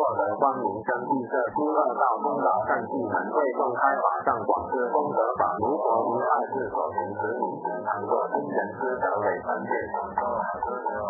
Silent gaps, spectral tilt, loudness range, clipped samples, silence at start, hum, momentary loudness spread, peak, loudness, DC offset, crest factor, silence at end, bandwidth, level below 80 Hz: none; -12.5 dB/octave; 3 LU; under 0.1%; 0 s; none; 5 LU; -8 dBFS; -26 LUFS; under 0.1%; 18 dB; 0 s; 2.1 kHz; -60 dBFS